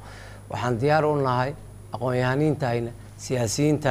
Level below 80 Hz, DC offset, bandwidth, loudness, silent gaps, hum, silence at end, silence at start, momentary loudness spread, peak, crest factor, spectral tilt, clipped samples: -50 dBFS; under 0.1%; 15.5 kHz; -24 LUFS; none; none; 0 s; 0 s; 17 LU; -6 dBFS; 18 dB; -6 dB/octave; under 0.1%